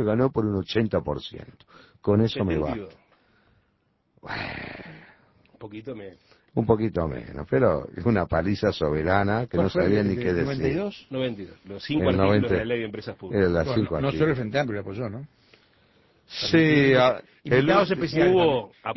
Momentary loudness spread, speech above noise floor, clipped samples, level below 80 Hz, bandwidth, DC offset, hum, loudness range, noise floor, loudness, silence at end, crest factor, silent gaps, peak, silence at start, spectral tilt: 18 LU; 46 dB; under 0.1%; -44 dBFS; 6 kHz; under 0.1%; none; 9 LU; -69 dBFS; -24 LUFS; 0 s; 20 dB; none; -4 dBFS; 0 s; -7.5 dB/octave